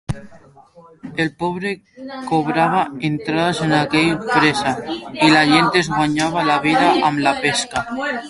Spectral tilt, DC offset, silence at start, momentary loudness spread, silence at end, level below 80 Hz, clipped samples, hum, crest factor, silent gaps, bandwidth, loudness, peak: -4.5 dB/octave; under 0.1%; 0.1 s; 12 LU; 0 s; -50 dBFS; under 0.1%; none; 18 dB; none; 11.5 kHz; -17 LUFS; 0 dBFS